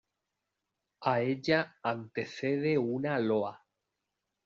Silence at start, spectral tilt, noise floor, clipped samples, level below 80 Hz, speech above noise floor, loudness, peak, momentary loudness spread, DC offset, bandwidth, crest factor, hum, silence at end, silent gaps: 1 s; -5 dB/octave; -86 dBFS; under 0.1%; -74 dBFS; 55 dB; -32 LUFS; -12 dBFS; 7 LU; under 0.1%; 7.4 kHz; 20 dB; none; 0.9 s; none